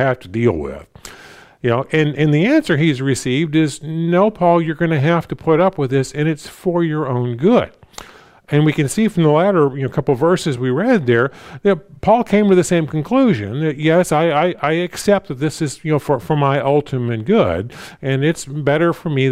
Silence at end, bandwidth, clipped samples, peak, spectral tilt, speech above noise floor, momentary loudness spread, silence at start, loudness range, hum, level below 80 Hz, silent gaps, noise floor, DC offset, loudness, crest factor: 0 s; 15 kHz; under 0.1%; -2 dBFS; -6.5 dB/octave; 27 dB; 8 LU; 0 s; 2 LU; none; -48 dBFS; none; -42 dBFS; under 0.1%; -17 LUFS; 14 dB